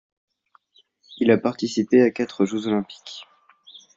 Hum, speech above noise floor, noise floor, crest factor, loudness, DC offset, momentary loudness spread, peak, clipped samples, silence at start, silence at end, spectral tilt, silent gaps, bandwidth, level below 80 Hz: none; 40 dB; -61 dBFS; 20 dB; -21 LUFS; under 0.1%; 19 LU; -4 dBFS; under 0.1%; 1.1 s; 0.75 s; -6 dB/octave; none; 7.8 kHz; -66 dBFS